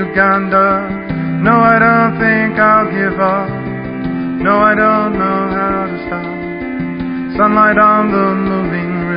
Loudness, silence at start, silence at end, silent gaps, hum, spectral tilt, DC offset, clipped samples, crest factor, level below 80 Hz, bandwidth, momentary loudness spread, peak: -13 LUFS; 0 s; 0 s; none; none; -10.5 dB/octave; under 0.1%; under 0.1%; 12 dB; -40 dBFS; 5.2 kHz; 12 LU; 0 dBFS